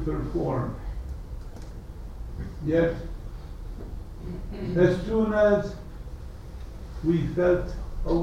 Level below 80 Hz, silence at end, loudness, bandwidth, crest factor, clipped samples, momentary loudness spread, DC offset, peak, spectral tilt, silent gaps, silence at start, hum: -36 dBFS; 0 s; -26 LUFS; 12.5 kHz; 18 dB; under 0.1%; 19 LU; under 0.1%; -8 dBFS; -8.5 dB/octave; none; 0 s; none